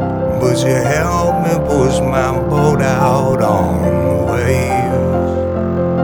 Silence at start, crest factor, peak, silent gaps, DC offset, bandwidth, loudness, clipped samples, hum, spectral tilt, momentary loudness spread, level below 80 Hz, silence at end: 0 s; 14 dB; 0 dBFS; none; under 0.1%; 20 kHz; -14 LUFS; under 0.1%; none; -6.5 dB/octave; 3 LU; -30 dBFS; 0 s